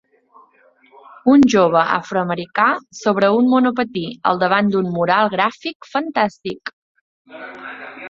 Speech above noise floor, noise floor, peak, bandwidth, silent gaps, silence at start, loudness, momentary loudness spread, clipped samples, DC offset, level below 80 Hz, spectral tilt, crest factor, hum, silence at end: 37 dB; -54 dBFS; -2 dBFS; 7.4 kHz; 5.75-5.80 s, 6.73-6.95 s, 7.01-7.25 s; 1.25 s; -17 LUFS; 19 LU; under 0.1%; under 0.1%; -60 dBFS; -5.5 dB/octave; 16 dB; none; 0 s